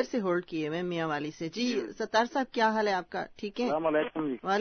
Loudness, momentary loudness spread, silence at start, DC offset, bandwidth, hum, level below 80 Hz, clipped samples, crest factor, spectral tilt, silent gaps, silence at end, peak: -30 LUFS; 6 LU; 0 s; under 0.1%; 6.6 kHz; none; -66 dBFS; under 0.1%; 16 dB; -5 dB/octave; none; 0 s; -14 dBFS